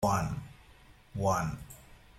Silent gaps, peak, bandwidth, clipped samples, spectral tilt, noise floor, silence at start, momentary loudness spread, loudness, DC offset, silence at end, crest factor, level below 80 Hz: none; -16 dBFS; 16 kHz; under 0.1%; -6 dB/octave; -57 dBFS; 0 s; 21 LU; -33 LUFS; under 0.1%; 0.25 s; 18 dB; -52 dBFS